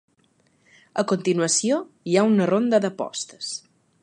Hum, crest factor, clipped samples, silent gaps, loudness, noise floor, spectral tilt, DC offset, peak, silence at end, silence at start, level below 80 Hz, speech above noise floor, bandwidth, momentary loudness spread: none; 18 dB; under 0.1%; none; -22 LUFS; -64 dBFS; -4.5 dB/octave; under 0.1%; -6 dBFS; 0.45 s; 0.95 s; -74 dBFS; 42 dB; 11.5 kHz; 12 LU